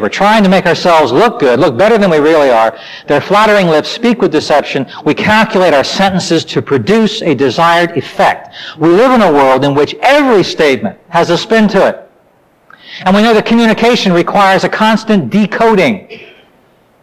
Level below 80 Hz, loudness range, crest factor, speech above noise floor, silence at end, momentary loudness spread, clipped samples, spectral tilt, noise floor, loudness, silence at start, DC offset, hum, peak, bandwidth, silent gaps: -44 dBFS; 2 LU; 8 dB; 40 dB; 0.75 s; 6 LU; under 0.1%; -5.5 dB/octave; -49 dBFS; -9 LUFS; 0 s; under 0.1%; none; -2 dBFS; 15.5 kHz; none